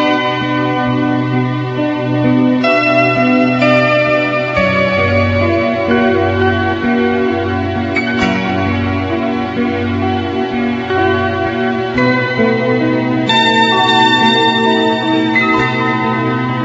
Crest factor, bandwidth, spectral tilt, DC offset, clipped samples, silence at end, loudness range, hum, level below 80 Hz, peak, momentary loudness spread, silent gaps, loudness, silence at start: 12 dB; 7.8 kHz; -6.5 dB/octave; under 0.1%; under 0.1%; 0 s; 5 LU; none; -44 dBFS; 0 dBFS; 6 LU; none; -13 LUFS; 0 s